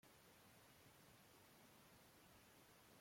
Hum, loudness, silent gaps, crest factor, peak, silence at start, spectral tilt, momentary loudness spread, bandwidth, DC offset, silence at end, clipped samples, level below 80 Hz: none; -68 LUFS; none; 12 dB; -56 dBFS; 0.05 s; -3 dB/octave; 0 LU; 16.5 kHz; under 0.1%; 0 s; under 0.1%; -86 dBFS